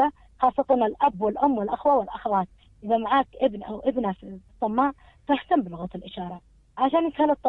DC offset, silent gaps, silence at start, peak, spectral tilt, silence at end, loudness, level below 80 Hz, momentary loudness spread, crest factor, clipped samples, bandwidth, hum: under 0.1%; none; 0 s; -8 dBFS; -8.5 dB/octave; 0 s; -25 LUFS; -54 dBFS; 14 LU; 18 dB; under 0.1%; 4.5 kHz; none